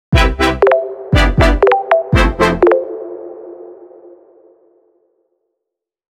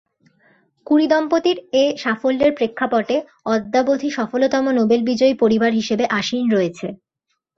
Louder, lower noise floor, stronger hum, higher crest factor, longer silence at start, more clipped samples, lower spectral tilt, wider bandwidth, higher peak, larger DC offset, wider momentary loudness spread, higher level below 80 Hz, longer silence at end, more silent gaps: first, -13 LUFS vs -18 LUFS; first, -79 dBFS vs -74 dBFS; neither; about the same, 14 dB vs 14 dB; second, 0.1 s vs 0.9 s; neither; first, -6.5 dB/octave vs -5 dB/octave; first, 13.5 kHz vs 7.6 kHz; first, 0 dBFS vs -4 dBFS; neither; first, 19 LU vs 6 LU; first, -22 dBFS vs -58 dBFS; first, 2.45 s vs 0.65 s; neither